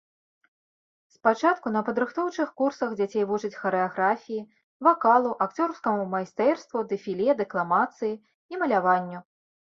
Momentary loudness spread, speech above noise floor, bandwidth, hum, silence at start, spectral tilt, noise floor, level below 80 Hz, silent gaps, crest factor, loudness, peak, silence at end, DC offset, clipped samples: 9 LU; over 65 dB; 7.6 kHz; none; 1.25 s; -6.5 dB/octave; under -90 dBFS; -74 dBFS; 4.64-4.80 s, 8.34-8.49 s; 20 dB; -26 LUFS; -6 dBFS; 0.55 s; under 0.1%; under 0.1%